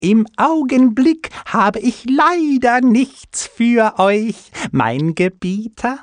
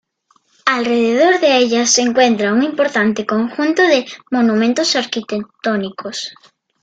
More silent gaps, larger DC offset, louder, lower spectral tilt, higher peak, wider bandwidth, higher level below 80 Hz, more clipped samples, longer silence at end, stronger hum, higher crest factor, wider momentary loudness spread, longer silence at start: neither; neither; about the same, -15 LUFS vs -15 LUFS; first, -5.5 dB/octave vs -3 dB/octave; about the same, -2 dBFS vs 0 dBFS; about the same, 10 kHz vs 9.2 kHz; first, -52 dBFS vs -62 dBFS; neither; second, 0 s vs 0.5 s; neither; about the same, 14 dB vs 16 dB; about the same, 10 LU vs 10 LU; second, 0 s vs 0.65 s